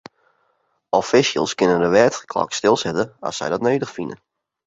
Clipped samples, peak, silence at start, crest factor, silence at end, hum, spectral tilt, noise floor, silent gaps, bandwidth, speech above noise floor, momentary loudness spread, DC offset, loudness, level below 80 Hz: under 0.1%; -2 dBFS; 0.95 s; 20 dB; 0.5 s; none; -4 dB/octave; -67 dBFS; none; 8 kHz; 48 dB; 10 LU; under 0.1%; -19 LUFS; -56 dBFS